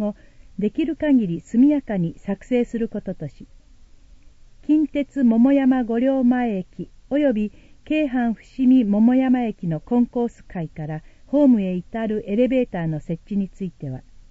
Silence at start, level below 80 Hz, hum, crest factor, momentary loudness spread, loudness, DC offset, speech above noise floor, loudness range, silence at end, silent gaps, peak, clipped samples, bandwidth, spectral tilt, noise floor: 0 s; -48 dBFS; none; 14 dB; 15 LU; -21 LUFS; under 0.1%; 27 dB; 4 LU; 0.3 s; none; -6 dBFS; under 0.1%; 7.6 kHz; -9 dB/octave; -47 dBFS